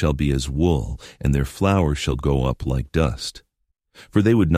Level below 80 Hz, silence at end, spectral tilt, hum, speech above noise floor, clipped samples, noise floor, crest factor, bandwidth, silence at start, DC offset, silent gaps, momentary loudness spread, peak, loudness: -30 dBFS; 0 s; -6.5 dB/octave; none; 47 dB; under 0.1%; -67 dBFS; 18 dB; 15 kHz; 0 s; under 0.1%; none; 7 LU; -4 dBFS; -22 LUFS